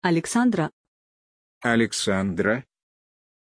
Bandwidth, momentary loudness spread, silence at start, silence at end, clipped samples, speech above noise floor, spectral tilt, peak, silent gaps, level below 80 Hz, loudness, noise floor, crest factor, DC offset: 10.5 kHz; 8 LU; 0 s; 0.95 s; under 0.1%; over 68 dB; -4.5 dB/octave; -6 dBFS; 0.73-1.61 s; -60 dBFS; -24 LUFS; under -90 dBFS; 18 dB; under 0.1%